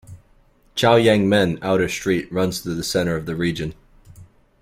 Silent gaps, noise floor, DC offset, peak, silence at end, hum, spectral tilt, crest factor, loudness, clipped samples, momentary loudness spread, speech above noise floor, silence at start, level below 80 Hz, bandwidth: none; -55 dBFS; under 0.1%; -2 dBFS; 0.4 s; none; -5 dB/octave; 18 dB; -20 LUFS; under 0.1%; 10 LU; 36 dB; 0.1 s; -48 dBFS; 16.5 kHz